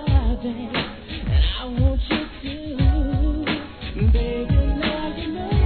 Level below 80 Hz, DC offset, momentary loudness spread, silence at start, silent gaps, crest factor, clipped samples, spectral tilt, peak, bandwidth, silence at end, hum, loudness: -24 dBFS; 0.3%; 9 LU; 0 s; none; 14 dB; under 0.1%; -10 dB/octave; -6 dBFS; 4.5 kHz; 0 s; none; -23 LUFS